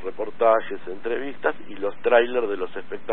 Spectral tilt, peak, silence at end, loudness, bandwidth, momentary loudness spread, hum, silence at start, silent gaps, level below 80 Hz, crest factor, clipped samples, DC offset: -9 dB/octave; -4 dBFS; 0 s; -24 LUFS; 4.2 kHz; 13 LU; none; 0 s; none; -64 dBFS; 20 dB; under 0.1%; 3%